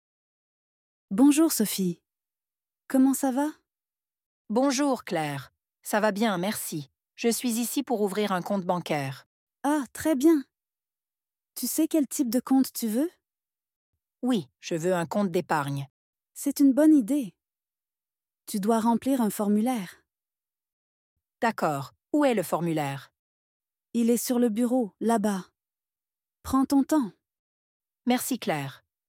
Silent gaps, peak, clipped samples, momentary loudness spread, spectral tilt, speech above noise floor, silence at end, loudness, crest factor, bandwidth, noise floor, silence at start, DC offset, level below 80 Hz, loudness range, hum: 4.26-4.45 s, 9.26-9.47 s, 13.76-13.93 s, 15.90-16.13 s, 20.73-21.16 s, 23.19-23.60 s, 27.39-27.80 s; -10 dBFS; under 0.1%; 12 LU; -5 dB/octave; over 65 dB; 0.3 s; -26 LUFS; 16 dB; 16.5 kHz; under -90 dBFS; 1.1 s; under 0.1%; -68 dBFS; 4 LU; none